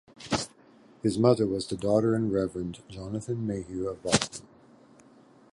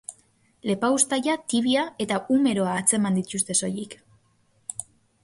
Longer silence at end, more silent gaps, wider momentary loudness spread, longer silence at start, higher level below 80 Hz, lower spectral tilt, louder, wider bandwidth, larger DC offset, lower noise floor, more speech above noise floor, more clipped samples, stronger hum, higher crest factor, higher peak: first, 1.1 s vs 0.4 s; neither; about the same, 13 LU vs 14 LU; about the same, 0.2 s vs 0.1 s; first, -54 dBFS vs -64 dBFS; first, -5 dB/octave vs -3.5 dB/octave; second, -28 LUFS vs -23 LUFS; about the same, 11.5 kHz vs 12 kHz; neither; second, -56 dBFS vs -64 dBFS; second, 29 dB vs 41 dB; neither; neither; first, 26 dB vs 20 dB; first, -2 dBFS vs -6 dBFS